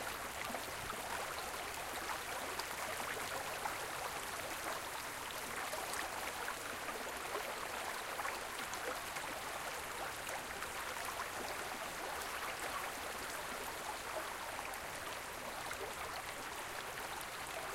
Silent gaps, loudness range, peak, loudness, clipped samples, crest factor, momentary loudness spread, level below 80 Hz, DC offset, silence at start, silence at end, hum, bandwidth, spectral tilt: none; 2 LU; -24 dBFS; -42 LUFS; under 0.1%; 20 dB; 3 LU; -64 dBFS; under 0.1%; 0 s; 0 s; none; 16 kHz; -1.5 dB/octave